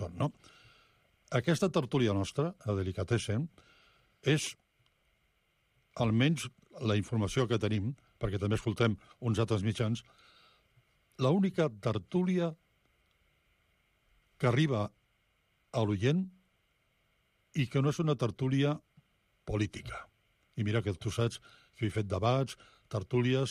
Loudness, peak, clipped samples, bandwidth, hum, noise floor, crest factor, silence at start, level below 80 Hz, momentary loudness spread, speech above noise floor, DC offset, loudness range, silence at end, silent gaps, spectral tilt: -33 LUFS; -16 dBFS; under 0.1%; 13.5 kHz; none; -74 dBFS; 18 dB; 0 s; -60 dBFS; 10 LU; 43 dB; under 0.1%; 3 LU; 0 s; none; -6.5 dB/octave